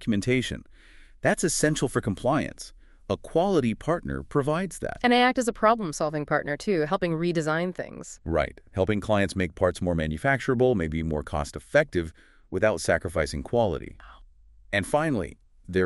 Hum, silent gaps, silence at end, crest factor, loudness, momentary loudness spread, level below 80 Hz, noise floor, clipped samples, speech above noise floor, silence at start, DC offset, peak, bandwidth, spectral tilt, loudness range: none; none; 0 s; 20 dB; -26 LUFS; 10 LU; -44 dBFS; -53 dBFS; under 0.1%; 27 dB; 0 s; under 0.1%; -6 dBFS; 12 kHz; -5 dB/octave; 3 LU